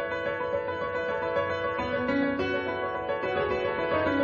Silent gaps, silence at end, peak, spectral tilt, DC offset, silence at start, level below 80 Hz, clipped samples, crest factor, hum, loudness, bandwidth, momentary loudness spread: none; 0 s; -14 dBFS; -7 dB/octave; under 0.1%; 0 s; -54 dBFS; under 0.1%; 14 dB; none; -29 LUFS; 7 kHz; 4 LU